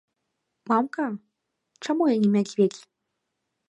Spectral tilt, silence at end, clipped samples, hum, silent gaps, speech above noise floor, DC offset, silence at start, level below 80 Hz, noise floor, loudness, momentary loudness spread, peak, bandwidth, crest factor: -6.5 dB/octave; 0.9 s; under 0.1%; none; none; 57 dB; under 0.1%; 0.65 s; -76 dBFS; -80 dBFS; -24 LUFS; 16 LU; -8 dBFS; 9.6 kHz; 18 dB